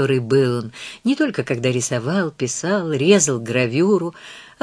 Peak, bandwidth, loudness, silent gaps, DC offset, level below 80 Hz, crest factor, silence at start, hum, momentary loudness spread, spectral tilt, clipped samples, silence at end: 0 dBFS; 11 kHz; -19 LUFS; none; under 0.1%; -62 dBFS; 18 dB; 0 s; none; 10 LU; -4.5 dB/octave; under 0.1%; 0.15 s